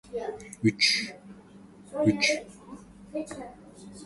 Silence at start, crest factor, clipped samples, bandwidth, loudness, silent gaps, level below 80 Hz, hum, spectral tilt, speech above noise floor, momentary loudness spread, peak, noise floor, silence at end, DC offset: 0.05 s; 22 dB; under 0.1%; 11.5 kHz; -27 LUFS; none; -60 dBFS; none; -3.5 dB/octave; 24 dB; 24 LU; -10 dBFS; -51 dBFS; 0 s; under 0.1%